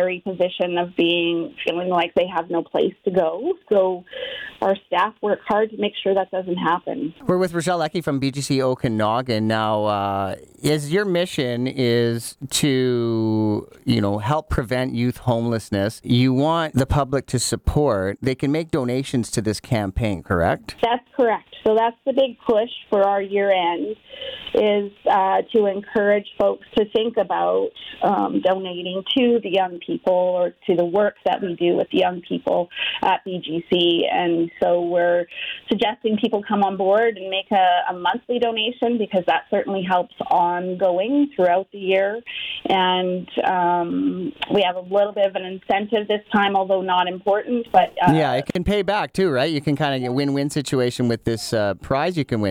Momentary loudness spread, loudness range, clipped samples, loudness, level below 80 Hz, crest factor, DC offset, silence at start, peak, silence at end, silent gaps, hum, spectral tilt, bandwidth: 5 LU; 2 LU; under 0.1%; -21 LUFS; -46 dBFS; 18 dB; under 0.1%; 0 s; -2 dBFS; 0 s; none; none; -5.5 dB/octave; 18 kHz